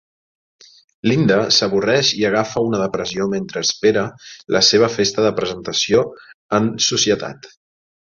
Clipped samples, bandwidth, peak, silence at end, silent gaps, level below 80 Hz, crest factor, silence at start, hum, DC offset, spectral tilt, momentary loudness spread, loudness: under 0.1%; 7.6 kHz; -2 dBFS; 0.65 s; 6.34-6.49 s; -54 dBFS; 18 dB; 1.05 s; none; under 0.1%; -3.5 dB/octave; 8 LU; -17 LUFS